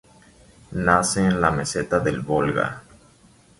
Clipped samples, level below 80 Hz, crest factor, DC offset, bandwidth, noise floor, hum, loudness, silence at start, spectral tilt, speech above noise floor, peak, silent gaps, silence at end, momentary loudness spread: under 0.1%; -44 dBFS; 20 dB; under 0.1%; 11.5 kHz; -54 dBFS; none; -21 LUFS; 0.7 s; -5 dB/octave; 33 dB; -2 dBFS; none; 0.8 s; 9 LU